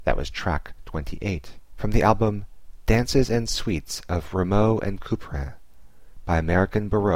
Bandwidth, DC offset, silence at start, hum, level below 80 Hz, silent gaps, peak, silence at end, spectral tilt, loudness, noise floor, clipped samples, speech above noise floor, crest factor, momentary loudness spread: 16 kHz; 0.8%; 0 s; none; -32 dBFS; none; -4 dBFS; 0 s; -6 dB/octave; -25 LUFS; -50 dBFS; under 0.1%; 27 dB; 20 dB; 13 LU